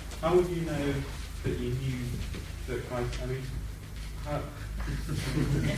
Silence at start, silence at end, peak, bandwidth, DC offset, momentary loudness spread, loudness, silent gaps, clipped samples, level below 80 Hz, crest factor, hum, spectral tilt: 0 s; 0 s; -14 dBFS; 16 kHz; under 0.1%; 12 LU; -33 LUFS; none; under 0.1%; -38 dBFS; 18 dB; none; -6.5 dB/octave